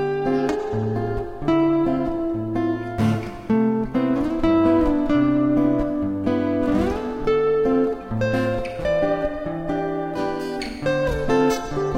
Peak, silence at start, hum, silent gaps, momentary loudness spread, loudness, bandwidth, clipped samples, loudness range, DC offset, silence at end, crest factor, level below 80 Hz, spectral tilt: -8 dBFS; 0 s; none; none; 7 LU; -22 LUFS; 15 kHz; under 0.1%; 3 LU; under 0.1%; 0 s; 14 dB; -38 dBFS; -7.5 dB/octave